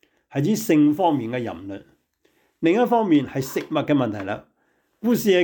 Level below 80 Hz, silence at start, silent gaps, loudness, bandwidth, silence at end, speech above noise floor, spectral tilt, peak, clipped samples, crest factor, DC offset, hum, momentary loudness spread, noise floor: -64 dBFS; 0.35 s; none; -22 LUFS; 19.5 kHz; 0 s; 47 dB; -6 dB/octave; -8 dBFS; under 0.1%; 14 dB; under 0.1%; none; 14 LU; -67 dBFS